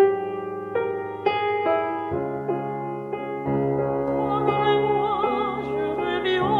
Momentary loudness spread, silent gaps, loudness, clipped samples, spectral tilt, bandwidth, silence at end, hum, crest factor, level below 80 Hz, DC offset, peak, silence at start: 8 LU; none; -25 LUFS; under 0.1%; -8 dB/octave; 5 kHz; 0 s; none; 16 dB; -54 dBFS; under 0.1%; -8 dBFS; 0 s